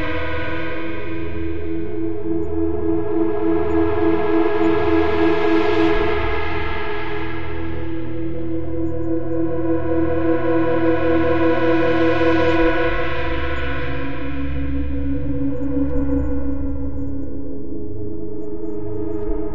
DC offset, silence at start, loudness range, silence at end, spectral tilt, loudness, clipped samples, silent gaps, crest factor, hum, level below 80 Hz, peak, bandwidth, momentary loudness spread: 10%; 0 s; 7 LU; 0 s; -8.5 dB/octave; -21 LUFS; under 0.1%; none; 14 dB; none; -32 dBFS; -4 dBFS; 6.2 kHz; 11 LU